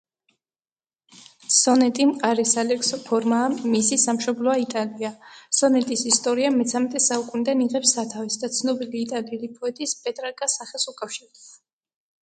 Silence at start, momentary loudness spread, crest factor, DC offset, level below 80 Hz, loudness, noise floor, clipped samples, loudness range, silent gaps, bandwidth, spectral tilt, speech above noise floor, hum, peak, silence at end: 1.5 s; 11 LU; 20 dB; under 0.1%; -72 dBFS; -22 LUFS; under -90 dBFS; under 0.1%; 7 LU; none; 9.6 kHz; -2 dB/octave; over 67 dB; none; -2 dBFS; 0.75 s